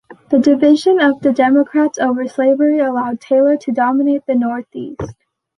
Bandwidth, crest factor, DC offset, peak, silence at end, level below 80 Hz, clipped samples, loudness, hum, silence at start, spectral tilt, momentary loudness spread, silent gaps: 10.5 kHz; 12 dB; under 0.1%; -2 dBFS; 0.45 s; -52 dBFS; under 0.1%; -14 LUFS; none; 0.1 s; -5.5 dB/octave; 14 LU; none